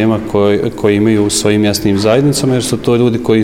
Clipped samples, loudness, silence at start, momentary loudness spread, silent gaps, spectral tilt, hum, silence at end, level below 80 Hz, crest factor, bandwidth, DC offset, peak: under 0.1%; -12 LUFS; 0 s; 3 LU; none; -5.5 dB/octave; none; 0 s; -38 dBFS; 12 dB; 16.5 kHz; under 0.1%; 0 dBFS